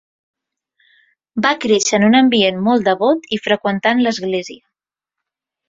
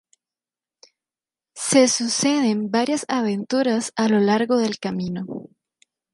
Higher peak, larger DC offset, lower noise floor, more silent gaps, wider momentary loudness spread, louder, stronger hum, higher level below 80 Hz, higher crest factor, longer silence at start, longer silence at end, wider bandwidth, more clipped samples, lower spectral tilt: about the same, -2 dBFS vs -2 dBFS; neither; second, -83 dBFS vs under -90 dBFS; neither; about the same, 10 LU vs 12 LU; first, -15 LUFS vs -21 LUFS; neither; first, -60 dBFS vs -66 dBFS; about the same, 16 dB vs 20 dB; second, 1.35 s vs 1.55 s; first, 1.15 s vs 0.7 s; second, 8 kHz vs 11.5 kHz; neither; about the same, -4 dB/octave vs -4 dB/octave